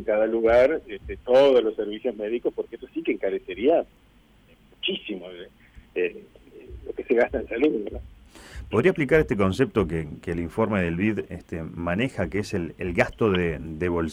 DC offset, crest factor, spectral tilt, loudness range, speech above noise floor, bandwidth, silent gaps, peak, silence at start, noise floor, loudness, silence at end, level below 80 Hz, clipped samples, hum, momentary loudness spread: under 0.1%; 18 dB; -7 dB/octave; 6 LU; 32 dB; 13.5 kHz; none; -6 dBFS; 0 s; -56 dBFS; -24 LUFS; 0 s; -46 dBFS; under 0.1%; none; 16 LU